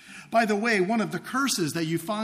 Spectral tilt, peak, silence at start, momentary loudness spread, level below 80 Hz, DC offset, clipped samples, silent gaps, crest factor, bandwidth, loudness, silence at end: -4 dB/octave; -10 dBFS; 0.05 s; 5 LU; -68 dBFS; under 0.1%; under 0.1%; none; 16 dB; 15.5 kHz; -25 LUFS; 0 s